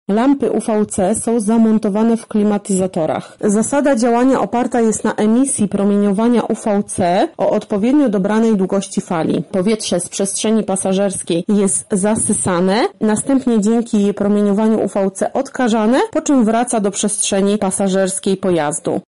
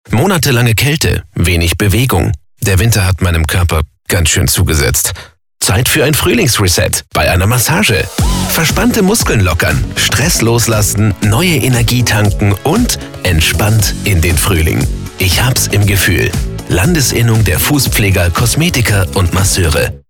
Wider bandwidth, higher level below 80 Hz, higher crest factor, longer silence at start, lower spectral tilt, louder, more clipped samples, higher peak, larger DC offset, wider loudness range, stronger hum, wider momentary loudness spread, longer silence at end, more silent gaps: second, 11.5 kHz vs 17.5 kHz; second, -50 dBFS vs -22 dBFS; about the same, 10 dB vs 10 dB; about the same, 0.1 s vs 0.1 s; about the same, -5 dB/octave vs -4 dB/octave; second, -15 LUFS vs -11 LUFS; neither; second, -4 dBFS vs 0 dBFS; first, 0.4% vs under 0.1%; about the same, 1 LU vs 1 LU; neither; about the same, 4 LU vs 5 LU; about the same, 0.05 s vs 0.1 s; neither